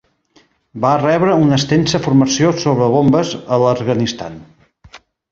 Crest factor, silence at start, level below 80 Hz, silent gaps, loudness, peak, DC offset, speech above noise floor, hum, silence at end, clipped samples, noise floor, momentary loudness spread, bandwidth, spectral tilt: 14 dB; 0.75 s; -48 dBFS; none; -14 LUFS; 0 dBFS; under 0.1%; 40 dB; none; 0.35 s; under 0.1%; -54 dBFS; 6 LU; 7.8 kHz; -6 dB/octave